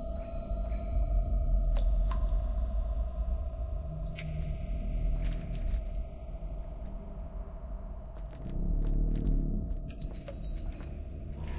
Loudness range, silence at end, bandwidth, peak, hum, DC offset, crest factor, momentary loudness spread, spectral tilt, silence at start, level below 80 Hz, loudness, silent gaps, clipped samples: 6 LU; 0 s; 4 kHz; -18 dBFS; none; under 0.1%; 14 dB; 11 LU; -11 dB/octave; 0 s; -32 dBFS; -37 LUFS; none; under 0.1%